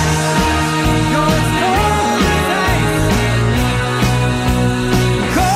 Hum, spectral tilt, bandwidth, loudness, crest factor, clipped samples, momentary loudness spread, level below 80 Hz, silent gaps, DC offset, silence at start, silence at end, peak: none; -5 dB/octave; 16 kHz; -14 LUFS; 12 dB; under 0.1%; 2 LU; -24 dBFS; none; under 0.1%; 0 s; 0 s; -2 dBFS